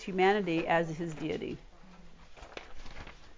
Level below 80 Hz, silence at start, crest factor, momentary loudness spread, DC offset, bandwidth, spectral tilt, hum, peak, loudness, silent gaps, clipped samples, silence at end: -54 dBFS; 0 s; 18 dB; 22 LU; under 0.1%; 7.6 kHz; -6 dB/octave; none; -16 dBFS; -31 LUFS; none; under 0.1%; 0.05 s